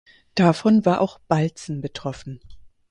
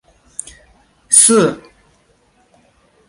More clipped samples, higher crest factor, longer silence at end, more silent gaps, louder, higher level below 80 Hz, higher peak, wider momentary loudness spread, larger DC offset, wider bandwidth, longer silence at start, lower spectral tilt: neither; about the same, 20 dB vs 18 dB; second, 0.25 s vs 1.5 s; neither; second, -21 LUFS vs -10 LUFS; about the same, -54 dBFS vs -56 dBFS; about the same, -2 dBFS vs 0 dBFS; second, 18 LU vs 23 LU; neither; second, 10.5 kHz vs 16 kHz; second, 0.35 s vs 1.1 s; first, -7 dB/octave vs -2.5 dB/octave